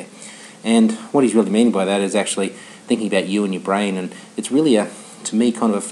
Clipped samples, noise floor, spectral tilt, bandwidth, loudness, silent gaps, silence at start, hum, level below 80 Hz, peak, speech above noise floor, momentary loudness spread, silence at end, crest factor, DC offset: under 0.1%; -39 dBFS; -5 dB/octave; 12 kHz; -19 LUFS; none; 0 s; none; -78 dBFS; -2 dBFS; 21 dB; 13 LU; 0 s; 16 dB; under 0.1%